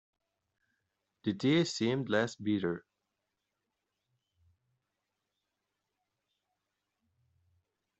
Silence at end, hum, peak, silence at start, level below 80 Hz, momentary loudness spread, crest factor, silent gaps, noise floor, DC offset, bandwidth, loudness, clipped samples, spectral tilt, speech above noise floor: 5.2 s; none; -16 dBFS; 1.25 s; -78 dBFS; 9 LU; 22 dB; none; -86 dBFS; under 0.1%; 8.2 kHz; -32 LUFS; under 0.1%; -5.5 dB/octave; 55 dB